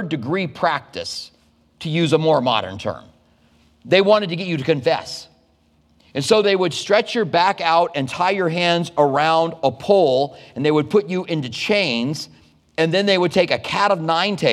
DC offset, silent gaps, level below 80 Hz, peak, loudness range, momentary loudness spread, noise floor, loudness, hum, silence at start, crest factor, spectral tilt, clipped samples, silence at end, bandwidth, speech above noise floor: under 0.1%; none; -60 dBFS; -2 dBFS; 4 LU; 12 LU; -59 dBFS; -19 LUFS; none; 0 s; 18 dB; -5 dB/octave; under 0.1%; 0 s; 13.5 kHz; 40 dB